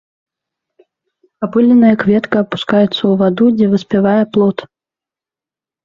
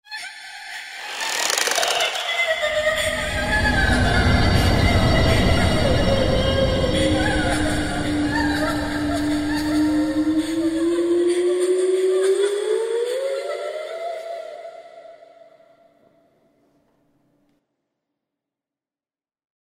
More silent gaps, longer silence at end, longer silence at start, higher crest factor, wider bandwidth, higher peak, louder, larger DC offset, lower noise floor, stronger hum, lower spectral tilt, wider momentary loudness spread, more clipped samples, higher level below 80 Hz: neither; second, 1.2 s vs 4.5 s; first, 1.4 s vs 0.1 s; second, 14 dB vs 20 dB; second, 7 kHz vs 16 kHz; about the same, 0 dBFS vs -2 dBFS; first, -12 LUFS vs -20 LUFS; neither; about the same, -89 dBFS vs under -90 dBFS; neither; first, -8 dB/octave vs -4.5 dB/octave; second, 7 LU vs 12 LU; neither; second, -54 dBFS vs -32 dBFS